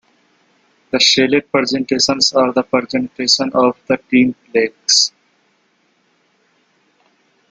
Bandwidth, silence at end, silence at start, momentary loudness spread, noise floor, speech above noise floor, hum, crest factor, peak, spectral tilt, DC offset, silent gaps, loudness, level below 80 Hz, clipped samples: 9.4 kHz; 2.4 s; 0.95 s; 7 LU; -60 dBFS; 45 dB; none; 18 dB; 0 dBFS; -2.5 dB/octave; under 0.1%; none; -14 LUFS; -58 dBFS; under 0.1%